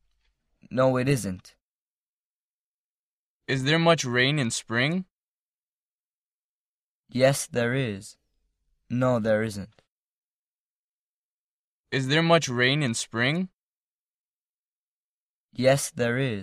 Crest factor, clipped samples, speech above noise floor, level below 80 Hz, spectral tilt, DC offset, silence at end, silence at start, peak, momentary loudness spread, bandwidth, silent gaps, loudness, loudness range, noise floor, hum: 22 dB; under 0.1%; over 66 dB; -62 dBFS; -4.5 dB/octave; under 0.1%; 0 s; 0.7 s; -6 dBFS; 14 LU; 15.5 kHz; 1.61-3.40 s, 5.11-7.04 s, 9.88-11.84 s, 13.53-15.49 s; -25 LUFS; 5 LU; under -90 dBFS; none